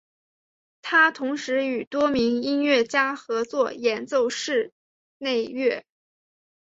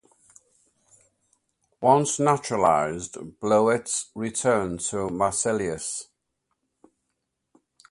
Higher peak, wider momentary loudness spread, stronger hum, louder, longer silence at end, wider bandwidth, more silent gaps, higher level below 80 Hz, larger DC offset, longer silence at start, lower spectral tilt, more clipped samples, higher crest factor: about the same, -6 dBFS vs -4 dBFS; about the same, 9 LU vs 11 LU; neither; about the same, -23 LUFS vs -24 LUFS; second, 0.85 s vs 1.85 s; second, 7.8 kHz vs 11.5 kHz; first, 1.87-1.91 s, 4.72-5.20 s vs none; second, -66 dBFS vs -58 dBFS; neither; second, 0.85 s vs 1.8 s; second, -3 dB/octave vs -4.5 dB/octave; neither; about the same, 18 dB vs 22 dB